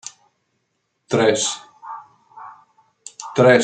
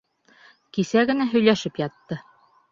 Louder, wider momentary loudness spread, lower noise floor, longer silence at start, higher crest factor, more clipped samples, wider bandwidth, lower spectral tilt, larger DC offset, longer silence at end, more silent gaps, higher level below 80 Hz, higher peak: first, -19 LUFS vs -22 LUFS; first, 25 LU vs 16 LU; first, -72 dBFS vs -55 dBFS; first, 1.1 s vs 0.75 s; about the same, 20 dB vs 22 dB; neither; first, 9.4 kHz vs 7.6 kHz; second, -4 dB/octave vs -5.5 dB/octave; neither; second, 0 s vs 0.5 s; neither; about the same, -68 dBFS vs -64 dBFS; about the same, -2 dBFS vs -4 dBFS